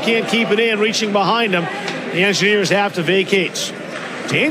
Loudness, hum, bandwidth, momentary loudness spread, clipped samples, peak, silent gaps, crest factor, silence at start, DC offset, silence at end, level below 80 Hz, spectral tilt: -16 LUFS; none; 14.5 kHz; 9 LU; under 0.1%; -2 dBFS; none; 16 dB; 0 s; under 0.1%; 0 s; -68 dBFS; -4 dB/octave